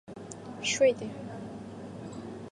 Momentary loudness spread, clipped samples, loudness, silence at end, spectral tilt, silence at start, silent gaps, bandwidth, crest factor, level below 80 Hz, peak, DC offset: 18 LU; under 0.1%; -31 LUFS; 0 s; -3.5 dB/octave; 0.05 s; none; 11.5 kHz; 20 dB; -64 dBFS; -14 dBFS; under 0.1%